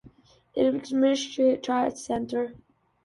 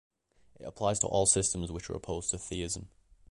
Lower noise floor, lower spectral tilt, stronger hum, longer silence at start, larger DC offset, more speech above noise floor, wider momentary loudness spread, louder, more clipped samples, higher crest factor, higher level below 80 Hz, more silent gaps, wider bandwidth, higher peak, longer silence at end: second, -55 dBFS vs -64 dBFS; about the same, -4.5 dB/octave vs -3.5 dB/octave; neither; second, 0.05 s vs 0.6 s; neither; about the same, 30 dB vs 32 dB; second, 8 LU vs 14 LU; first, -26 LUFS vs -31 LUFS; neither; second, 16 dB vs 22 dB; second, -62 dBFS vs -50 dBFS; neither; about the same, 11.5 kHz vs 11.5 kHz; about the same, -12 dBFS vs -12 dBFS; about the same, 0.5 s vs 0.45 s